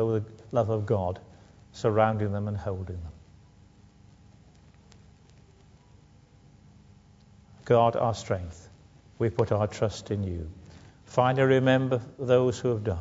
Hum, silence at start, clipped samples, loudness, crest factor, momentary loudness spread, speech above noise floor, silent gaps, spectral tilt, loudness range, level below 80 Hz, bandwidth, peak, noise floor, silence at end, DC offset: 50 Hz at -55 dBFS; 0 s; under 0.1%; -27 LUFS; 20 dB; 17 LU; 30 dB; none; -7 dB/octave; 10 LU; -54 dBFS; 7.8 kHz; -8 dBFS; -56 dBFS; 0 s; under 0.1%